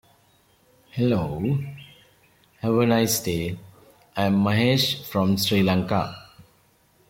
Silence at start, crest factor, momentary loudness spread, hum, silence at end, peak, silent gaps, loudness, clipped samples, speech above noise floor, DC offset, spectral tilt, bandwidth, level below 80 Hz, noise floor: 0.95 s; 18 dB; 15 LU; none; 0.7 s; -8 dBFS; none; -23 LUFS; under 0.1%; 39 dB; under 0.1%; -5 dB/octave; 16.5 kHz; -54 dBFS; -61 dBFS